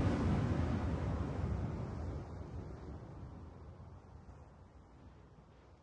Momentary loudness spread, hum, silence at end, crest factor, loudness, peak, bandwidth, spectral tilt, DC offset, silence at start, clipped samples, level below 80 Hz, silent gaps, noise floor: 25 LU; none; 0 s; 18 dB; -40 LUFS; -22 dBFS; 9.2 kHz; -8.5 dB/octave; under 0.1%; 0 s; under 0.1%; -48 dBFS; none; -60 dBFS